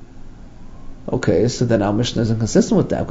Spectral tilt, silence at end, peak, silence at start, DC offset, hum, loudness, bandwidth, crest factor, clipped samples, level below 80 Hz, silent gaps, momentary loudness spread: -6 dB/octave; 0 s; -2 dBFS; 0 s; under 0.1%; none; -18 LUFS; 7.8 kHz; 16 dB; under 0.1%; -36 dBFS; none; 6 LU